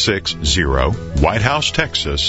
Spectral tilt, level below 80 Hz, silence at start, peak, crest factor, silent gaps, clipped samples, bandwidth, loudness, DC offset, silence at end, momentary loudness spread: -4 dB/octave; -26 dBFS; 0 s; 0 dBFS; 16 dB; none; under 0.1%; 8 kHz; -17 LUFS; under 0.1%; 0 s; 3 LU